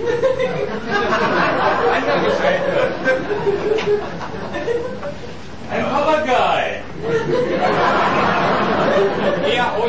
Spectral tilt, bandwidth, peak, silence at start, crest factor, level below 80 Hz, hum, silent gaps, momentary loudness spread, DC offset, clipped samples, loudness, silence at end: -5.5 dB/octave; 8 kHz; -4 dBFS; 0 s; 12 dB; -44 dBFS; none; none; 10 LU; 3%; under 0.1%; -18 LUFS; 0 s